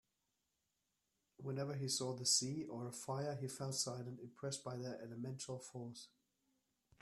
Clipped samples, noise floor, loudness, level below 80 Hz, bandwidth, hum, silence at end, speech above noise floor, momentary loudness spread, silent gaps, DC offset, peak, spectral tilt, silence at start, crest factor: under 0.1%; -87 dBFS; -43 LUFS; -82 dBFS; 13.5 kHz; none; 0.95 s; 43 dB; 16 LU; none; under 0.1%; -20 dBFS; -3.5 dB/octave; 1.4 s; 26 dB